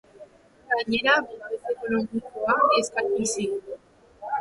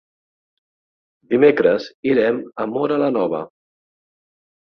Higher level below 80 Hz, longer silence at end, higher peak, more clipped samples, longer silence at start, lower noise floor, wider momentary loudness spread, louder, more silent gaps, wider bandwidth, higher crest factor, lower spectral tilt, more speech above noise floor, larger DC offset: about the same, -62 dBFS vs -62 dBFS; second, 0 s vs 1.2 s; second, -6 dBFS vs -2 dBFS; neither; second, 0.15 s vs 1.3 s; second, -50 dBFS vs under -90 dBFS; first, 14 LU vs 11 LU; second, -25 LUFS vs -18 LUFS; second, none vs 1.94-2.03 s; first, 11.5 kHz vs 6.2 kHz; about the same, 20 dB vs 18 dB; second, -3 dB/octave vs -7.5 dB/octave; second, 26 dB vs over 72 dB; neither